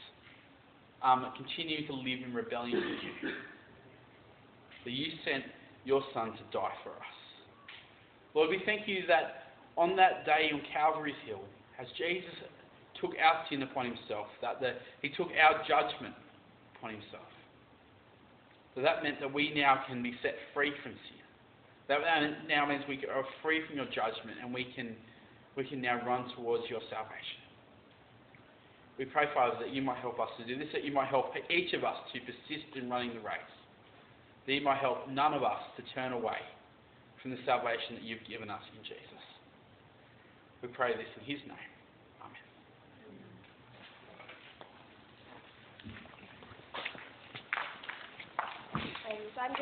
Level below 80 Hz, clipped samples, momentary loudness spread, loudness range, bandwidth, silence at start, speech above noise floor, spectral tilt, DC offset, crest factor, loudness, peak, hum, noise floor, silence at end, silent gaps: -74 dBFS; under 0.1%; 23 LU; 12 LU; 4.6 kHz; 0 s; 27 dB; -1.5 dB/octave; under 0.1%; 26 dB; -34 LUFS; -10 dBFS; none; -61 dBFS; 0 s; none